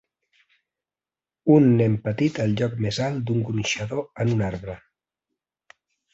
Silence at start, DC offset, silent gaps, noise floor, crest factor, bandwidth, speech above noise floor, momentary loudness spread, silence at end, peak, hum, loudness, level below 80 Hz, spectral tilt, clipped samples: 1.45 s; under 0.1%; none; under -90 dBFS; 20 dB; 8 kHz; over 68 dB; 12 LU; 1.35 s; -4 dBFS; none; -23 LUFS; -52 dBFS; -6.5 dB/octave; under 0.1%